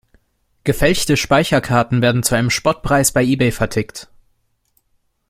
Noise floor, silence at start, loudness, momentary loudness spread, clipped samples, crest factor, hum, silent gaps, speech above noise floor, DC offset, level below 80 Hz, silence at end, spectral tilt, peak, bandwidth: -64 dBFS; 0.65 s; -16 LUFS; 8 LU; under 0.1%; 16 dB; none; none; 49 dB; under 0.1%; -36 dBFS; 1.25 s; -4.5 dB/octave; -2 dBFS; 16.5 kHz